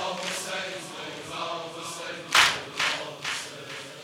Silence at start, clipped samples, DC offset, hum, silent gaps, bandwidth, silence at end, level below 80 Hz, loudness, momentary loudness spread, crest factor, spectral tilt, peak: 0 s; under 0.1%; under 0.1%; none; none; 16 kHz; 0 s; -66 dBFS; -27 LUFS; 17 LU; 26 dB; -0.5 dB/octave; -4 dBFS